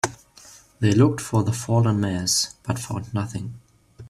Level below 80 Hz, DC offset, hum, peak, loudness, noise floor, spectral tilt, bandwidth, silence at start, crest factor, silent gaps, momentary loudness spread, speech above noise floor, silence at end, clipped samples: -54 dBFS; under 0.1%; none; -4 dBFS; -23 LUFS; -49 dBFS; -5 dB/octave; 14 kHz; 0.05 s; 18 dB; none; 11 LU; 27 dB; 0 s; under 0.1%